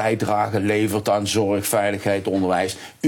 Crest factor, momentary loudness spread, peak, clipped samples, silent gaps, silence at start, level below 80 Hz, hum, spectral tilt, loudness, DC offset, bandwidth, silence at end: 14 dB; 2 LU; -6 dBFS; under 0.1%; none; 0 s; -64 dBFS; none; -5 dB/octave; -21 LUFS; under 0.1%; 17 kHz; 0 s